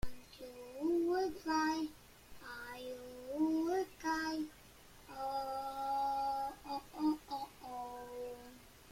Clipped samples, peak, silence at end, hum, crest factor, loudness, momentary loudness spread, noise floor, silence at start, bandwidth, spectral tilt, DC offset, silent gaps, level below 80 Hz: under 0.1%; -24 dBFS; 0 s; none; 16 dB; -39 LUFS; 18 LU; -59 dBFS; 0.05 s; 16.5 kHz; -4.5 dB/octave; under 0.1%; none; -62 dBFS